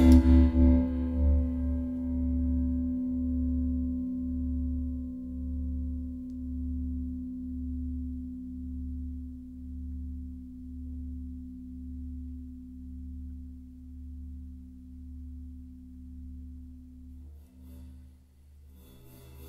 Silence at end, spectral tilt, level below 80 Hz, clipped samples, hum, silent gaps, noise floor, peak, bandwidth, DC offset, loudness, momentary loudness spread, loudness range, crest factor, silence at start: 0 s; -9.5 dB/octave; -34 dBFS; under 0.1%; none; none; -55 dBFS; -8 dBFS; 6 kHz; under 0.1%; -31 LUFS; 20 LU; 17 LU; 22 dB; 0 s